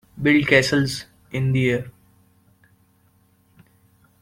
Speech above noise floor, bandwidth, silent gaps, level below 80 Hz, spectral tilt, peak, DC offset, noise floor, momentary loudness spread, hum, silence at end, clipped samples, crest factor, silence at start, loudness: 41 dB; 16 kHz; none; -52 dBFS; -5.5 dB/octave; -2 dBFS; under 0.1%; -60 dBFS; 16 LU; none; 2.3 s; under 0.1%; 22 dB; 0.15 s; -20 LUFS